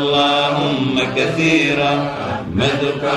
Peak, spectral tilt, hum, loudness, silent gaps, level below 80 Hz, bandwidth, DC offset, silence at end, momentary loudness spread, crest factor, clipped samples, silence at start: -4 dBFS; -5 dB/octave; none; -16 LUFS; none; -46 dBFS; 12 kHz; under 0.1%; 0 s; 6 LU; 14 dB; under 0.1%; 0 s